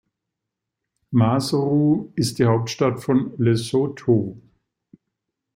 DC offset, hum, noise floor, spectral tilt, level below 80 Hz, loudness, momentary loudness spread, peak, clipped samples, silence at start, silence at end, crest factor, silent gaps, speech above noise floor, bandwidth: under 0.1%; none; -83 dBFS; -7 dB/octave; -56 dBFS; -21 LUFS; 4 LU; -4 dBFS; under 0.1%; 1.1 s; 1.15 s; 18 dB; none; 63 dB; 16 kHz